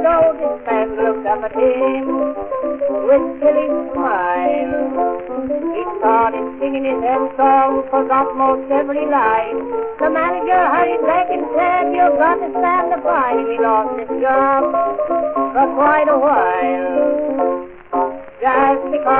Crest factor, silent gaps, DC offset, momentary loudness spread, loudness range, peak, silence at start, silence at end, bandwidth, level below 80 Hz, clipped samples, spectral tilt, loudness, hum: 16 dB; none; 0.5%; 7 LU; 2 LU; 0 dBFS; 0 s; 0 s; 3.9 kHz; -48 dBFS; under 0.1%; -3.5 dB/octave; -16 LUFS; none